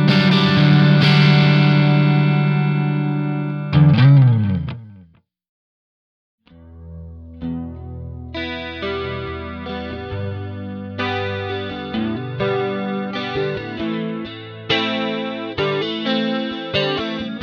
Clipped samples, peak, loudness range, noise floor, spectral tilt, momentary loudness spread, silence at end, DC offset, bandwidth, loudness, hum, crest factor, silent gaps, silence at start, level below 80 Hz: under 0.1%; -2 dBFS; 16 LU; -50 dBFS; -8 dB/octave; 17 LU; 0 s; under 0.1%; 6.4 kHz; -18 LUFS; none; 16 dB; 5.49-6.38 s; 0 s; -44 dBFS